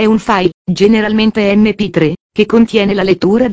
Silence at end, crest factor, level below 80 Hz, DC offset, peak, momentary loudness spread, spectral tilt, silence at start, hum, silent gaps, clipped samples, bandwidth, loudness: 0 s; 10 dB; -40 dBFS; under 0.1%; 0 dBFS; 4 LU; -6.5 dB/octave; 0 s; none; 0.54-0.65 s, 2.20-2.30 s; under 0.1%; 8 kHz; -11 LUFS